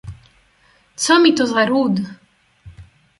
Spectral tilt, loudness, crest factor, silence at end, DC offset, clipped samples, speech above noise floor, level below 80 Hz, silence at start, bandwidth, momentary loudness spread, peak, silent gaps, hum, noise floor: -4 dB/octave; -16 LUFS; 18 dB; 0.35 s; under 0.1%; under 0.1%; 41 dB; -50 dBFS; 0.05 s; 11.5 kHz; 16 LU; -2 dBFS; none; none; -56 dBFS